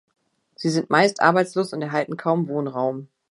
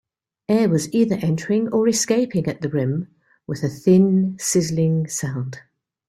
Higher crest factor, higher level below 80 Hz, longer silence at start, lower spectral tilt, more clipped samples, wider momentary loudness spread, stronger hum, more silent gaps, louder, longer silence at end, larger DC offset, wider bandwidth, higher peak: first, 22 dB vs 16 dB; second, -74 dBFS vs -58 dBFS; about the same, 0.6 s vs 0.5 s; about the same, -5.5 dB/octave vs -6 dB/octave; neither; second, 9 LU vs 13 LU; neither; neither; about the same, -22 LUFS vs -20 LUFS; second, 0.25 s vs 0.5 s; neither; second, 11.5 kHz vs 14 kHz; about the same, -2 dBFS vs -4 dBFS